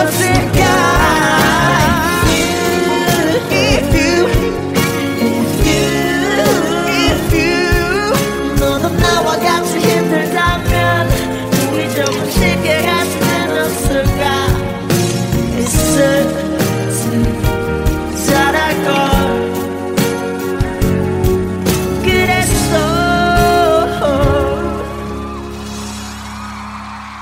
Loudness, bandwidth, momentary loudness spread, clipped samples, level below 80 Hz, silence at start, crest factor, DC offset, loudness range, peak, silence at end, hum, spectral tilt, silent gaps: -13 LUFS; 16.5 kHz; 8 LU; under 0.1%; -24 dBFS; 0 s; 12 dB; under 0.1%; 3 LU; 0 dBFS; 0 s; none; -4.5 dB/octave; none